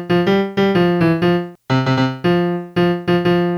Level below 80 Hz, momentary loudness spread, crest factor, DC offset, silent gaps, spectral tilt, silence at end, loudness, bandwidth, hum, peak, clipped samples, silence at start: -50 dBFS; 4 LU; 12 dB; under 0.1%; none; -8 dB/octave; 0 s; -16 LUFS; 12 kHz; none; -4 dBFS; under 0.1%; 0 s